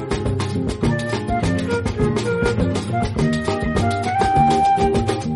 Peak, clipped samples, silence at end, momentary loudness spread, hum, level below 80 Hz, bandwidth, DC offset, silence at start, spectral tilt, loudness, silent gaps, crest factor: -4 dBFS; under 0.1%; 0 s; 6 LU; none; -32 dBFS; 11.5 kHz; under 0.1%; 0 s; -6.5 dB/octave; -20 LUFS; none; 14 dB